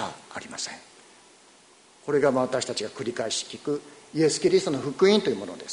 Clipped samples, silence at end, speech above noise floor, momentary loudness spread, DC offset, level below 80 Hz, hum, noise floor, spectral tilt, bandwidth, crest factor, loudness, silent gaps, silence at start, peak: under 0.1%; 0 s; 30 dB; 14 LU; under 0.1%; -68 dBFS; none; -55 dBFS; -4 dB/octave; 11 kHz; 20 dB; -26 LUFS; none; 0 s; -6 dBFS